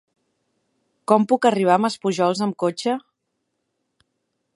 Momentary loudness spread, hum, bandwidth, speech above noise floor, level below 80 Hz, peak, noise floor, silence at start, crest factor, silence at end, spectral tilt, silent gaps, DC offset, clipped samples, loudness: 9 LU; none; 11.5 kHz; 57 dB; -74 dBFS; -2 dBFS; -76 dBFS; 1.1 s; 22 dB; 1.55 s; -5.5 dB/octave; none; under 0.1%; under 0.1%; -20 LUFS